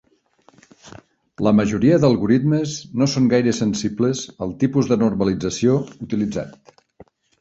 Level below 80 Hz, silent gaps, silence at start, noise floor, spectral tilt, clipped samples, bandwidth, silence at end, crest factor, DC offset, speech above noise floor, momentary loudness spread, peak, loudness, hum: -50 dBFS; none; 0.85 s; -57 dBFS; -6.5 dB/octave; under 0.1%; 8 kHz; 0.9 s; 18 dB; under 0.1%; 39 dB; 9 LU; -2 dBFS; -19 LUFS; none